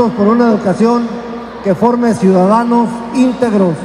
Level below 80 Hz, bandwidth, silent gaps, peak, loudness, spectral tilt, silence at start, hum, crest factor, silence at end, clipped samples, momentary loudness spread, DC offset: -46 dBFS; 10.5 kHz; none; 0 dBFS; -12 LUFS; -7.5 dB/octave; 0 s; none; 12 dB; 0 s; under 0.1%; 9 LU; under 0.1%